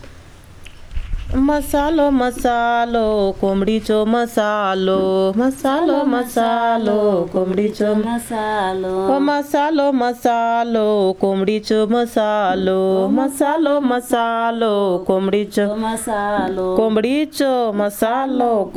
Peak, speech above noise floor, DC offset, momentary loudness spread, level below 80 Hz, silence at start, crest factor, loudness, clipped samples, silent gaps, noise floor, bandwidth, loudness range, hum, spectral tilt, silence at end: -2 dBFS; 23 dB; under 0.1%; 3 LU; -38 dBFS; 0 s; 16 dB; -17 LUFS; under 0.1%; none; -40 dBFS; 15.5 kHz; 1 LU; none; -5.5 dB/octave; 0 s